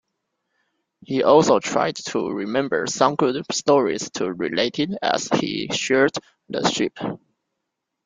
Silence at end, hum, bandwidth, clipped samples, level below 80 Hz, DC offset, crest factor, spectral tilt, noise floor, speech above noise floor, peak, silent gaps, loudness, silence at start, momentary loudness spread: 0.9 s; none; 9.6 kHz; under 0.1%; -62 dBFS; under 0.1%; 20 dB; -4 dB/octave; -80 dBFS; 59 dB; -2 dBFS; none; -21 LUFS; 1.1 s; 10 LU